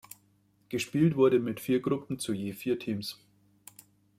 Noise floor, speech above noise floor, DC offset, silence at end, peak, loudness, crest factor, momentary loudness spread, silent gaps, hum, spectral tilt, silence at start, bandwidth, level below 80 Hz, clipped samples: -67 dBFS; 39 dB; under 0.1%; 1.05 s; -14 dBFS; -30 LUFS; 18 dB; 14 LU; none; 50 Hz at -55 dBFS; -6 dB/octave; 0.7 s; 16 kHz; -68 dBFS; under 0.1%